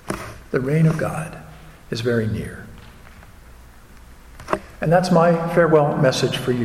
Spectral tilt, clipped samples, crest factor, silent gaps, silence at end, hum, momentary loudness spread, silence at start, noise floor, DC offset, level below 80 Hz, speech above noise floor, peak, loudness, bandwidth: -6.5 dB/octave; under 0.1%; 18 dB; none; 0 s; none; 16 LU; 0.05 s; -44 dBFS; under 0.1%; -44 dBFS; 25 dB; -2 dBFS; -20 LUFS; 14.5 kHz